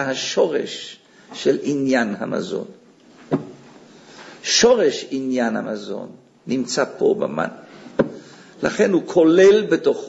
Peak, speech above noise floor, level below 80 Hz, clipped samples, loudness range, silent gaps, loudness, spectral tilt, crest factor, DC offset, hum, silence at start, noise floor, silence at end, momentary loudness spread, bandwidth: -2 dBFS; 29 dB; -60 dBFS; under 0.1%; 6 LU; none; -19 LUFS; -4 dB/octave; 18 dB; under 0.1%; none; 0 s; -48 dBFS; 0 s; 18 LU; 8 kHz